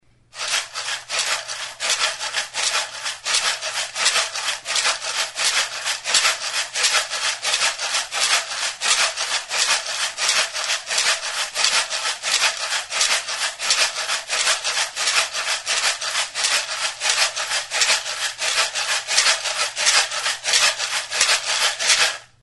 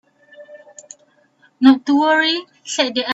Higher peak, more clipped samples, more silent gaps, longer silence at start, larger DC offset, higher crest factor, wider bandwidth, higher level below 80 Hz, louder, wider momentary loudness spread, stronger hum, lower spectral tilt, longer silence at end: about the same, 0 dBFS vs 0 dBFS; neither; neither; about the same, 0.35 s vs 0.4 s; neither; about the same, 22 dB vs 18 dB; first, 12 kHz vs 8 kHz; about the same, -64 dBFS vs -66 dBFS; second, -19 LUFS vs -16 LUFS; about the same, 7 LU vs 9 LU; neither; second, 3.5 dB/octave vs -2 dB/octave; first, 0.2 s vs 0 s